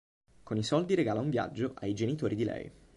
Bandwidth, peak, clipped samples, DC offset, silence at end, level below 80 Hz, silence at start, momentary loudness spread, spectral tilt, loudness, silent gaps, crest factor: 11 kHz; -16 dBFS; under 0.1%; under 0.1%; 0.25 s; -62 dBFS; 0.45 s; 7 LU; -6.5 dB/octave; -32 LUFS; none; 16 dB